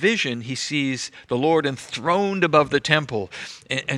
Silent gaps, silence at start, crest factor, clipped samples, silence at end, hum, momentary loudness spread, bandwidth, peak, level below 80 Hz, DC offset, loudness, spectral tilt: none; 0 s; 22 dB; under 0.1%; 0 s; none; 11 LU; 12 kHz; 0 dBFS; -60 dBFS; under 0.1%; -22 LUFS; -4.5 dB/octave